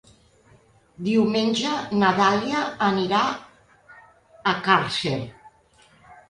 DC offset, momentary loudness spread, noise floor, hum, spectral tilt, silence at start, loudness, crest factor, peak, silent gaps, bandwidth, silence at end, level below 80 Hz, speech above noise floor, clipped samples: under 0.1%; 9 LU; -57 dBFS; none; -5 dB/octave; 1 s; -22 LUFS; 22 dB; -4 dBFS; none; 11 kHz; 0.15 s; -60 dBFS; 35 dB; under 0.1%